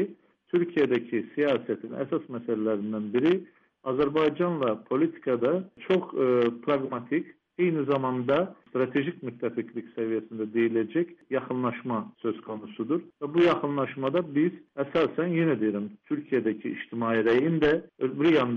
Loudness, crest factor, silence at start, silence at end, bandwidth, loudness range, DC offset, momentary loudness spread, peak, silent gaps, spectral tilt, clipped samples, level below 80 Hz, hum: -28 LUFS; 14 dB; 0 s; 0 s; 6.4 kHz; 3 LU; under 0.1%; 10 LU; -12 dBFS; none; -8.5 dB/octave; under 0.1%; -64 dBFS; none